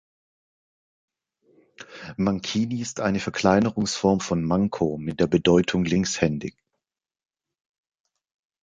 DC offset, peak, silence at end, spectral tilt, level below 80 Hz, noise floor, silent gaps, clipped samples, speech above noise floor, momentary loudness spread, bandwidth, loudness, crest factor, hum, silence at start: under 0.1%; -4 dBFS; 2.15 s; -5.5 dB/octave; -50 dBFS; -87 dBFS; none; under 0.1%; 65 dB; 9 LU; 9.2 kHz; -23 LUFS; 22 dB; none; 1.8 s